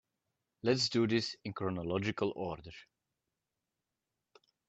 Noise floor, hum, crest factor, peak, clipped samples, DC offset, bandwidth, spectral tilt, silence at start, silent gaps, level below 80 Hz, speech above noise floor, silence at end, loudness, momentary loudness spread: -89 dBFS; none; 20 dB; -18 dBFS; under 0.1%; under 0.1%; 8.2 kHz; -5 dB/octave; 0.65 s; none; -68 dBFS; 54 dB; 1.85 s; -34 LUFS; 15 LU